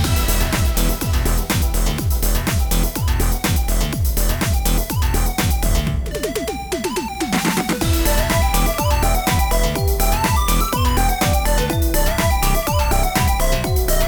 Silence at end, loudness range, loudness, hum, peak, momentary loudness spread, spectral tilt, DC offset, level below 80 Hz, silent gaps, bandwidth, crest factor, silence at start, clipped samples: 0 s; 2 LU; -19 LUFS; none; -4 dBFS; 3 LU; -4.5 dB/octave; under 0.1%; -20 dBFS; none; over 20 kHz; 14 dB; 0 s; under 0.1%